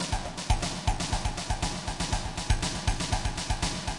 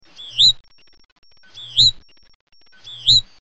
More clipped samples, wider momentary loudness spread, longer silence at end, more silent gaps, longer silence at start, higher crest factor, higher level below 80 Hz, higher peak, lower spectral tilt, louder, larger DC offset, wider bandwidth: neither; second, 3 LU vs 18 LU; second, 0 s vs 0.2 s; second, none vs 1.12-1.16 s, 2.35-2.47 s; second, 0 s vs 0.2 s; about the same, 18 dB vs 18 dB; first, -34 dBFS vs -44 dBFS; second, -12 dBFS vs -4 dBFS; first, -3.5 dB/octave vs 0 dB/octave; second, -31 LUFS vs -14 LUFS; second, under 0.1% vs 0.3%; first, 11.5 kHz vs 8.4 kHz